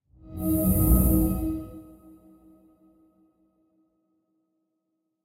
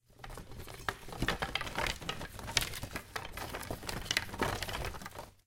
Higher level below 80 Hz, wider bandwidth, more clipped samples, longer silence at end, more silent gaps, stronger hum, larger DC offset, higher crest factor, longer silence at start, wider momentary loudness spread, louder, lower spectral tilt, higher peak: first, -32 dBFS vs -48 dBFS; about the same, 16 kHz vs 17 kHz; neither; first, 3.4 s vs 0.1 s; neither; neither; neither; second, 20 dB vs 30 dB; first, 0.25 s vs 0.1 s; first, 22 LU vs 14 LU; first, -24 LUFS vs -37 LUFS; first, -8 dB/octave vs -3 dB/octave; about the same, -8 dBFS vs -10 dBFS